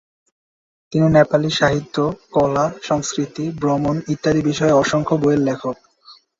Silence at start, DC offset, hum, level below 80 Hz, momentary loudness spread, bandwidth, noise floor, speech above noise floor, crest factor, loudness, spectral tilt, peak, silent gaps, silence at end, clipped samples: 0.9 s; under 0.1%; none; -48 dBFS; 9 LU; 7.8 kHz; -48 dBFS; 31 dB; 16 dB; -18 LUFS; -6 dB/octave; -2 dBFS; none; 0.25 s; under 0.1%